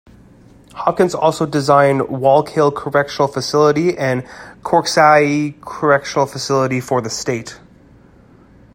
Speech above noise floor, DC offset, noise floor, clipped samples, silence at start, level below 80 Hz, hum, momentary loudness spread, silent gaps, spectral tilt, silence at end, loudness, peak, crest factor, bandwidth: 31 dB; under 0.1%; -46 dBFS; under 0.1%; 0.75 s; -52 dBFS; none; 10 LU; none; -5 dB/octave; 1.15 s; -16 LUFS; 0 dBFS; 16 dB; 16.5 kHz